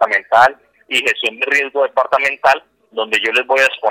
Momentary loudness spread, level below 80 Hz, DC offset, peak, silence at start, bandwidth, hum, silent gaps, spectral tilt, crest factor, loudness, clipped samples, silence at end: 6 LU; -60 dBFS; under 0.1%; 0 dBFS; 0 s; 18.5 kHz; none; none; -1 dB/octave; 16 dB; -14 LUFS; under 0.1%; 0 s